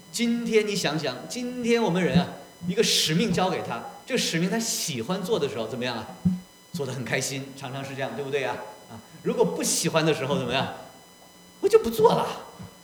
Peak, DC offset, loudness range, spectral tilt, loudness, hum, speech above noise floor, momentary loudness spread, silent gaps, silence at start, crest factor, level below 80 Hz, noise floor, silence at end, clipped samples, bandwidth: -4 dBFS; under 0.1%; 6 LU; -4 dB/octave; -26 LUFS; none; 25 dB; 14 LU; none; 0.1 s; 22 dB; -58 dBFS; -51 dBFS; 0.05 s; under 0.1%; over 20 kHz